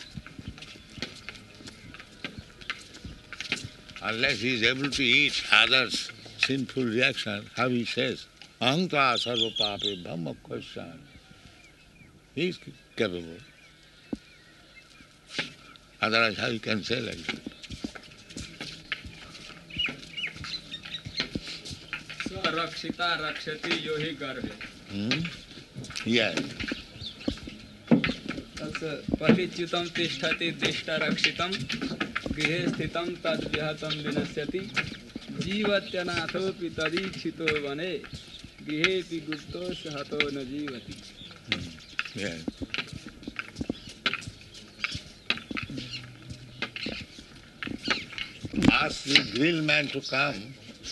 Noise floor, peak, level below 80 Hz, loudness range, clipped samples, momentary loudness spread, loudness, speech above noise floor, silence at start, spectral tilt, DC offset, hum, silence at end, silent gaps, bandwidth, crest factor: -54 dBFS; -2 dBFS; -54 dBFS; 11 LU; under 0.1%; 19 LU; -29 LUFS; 26 dB; 0 s; -4 dB/octave; under 0.1%; none; 0 s; none; 12 kHz; 28 dB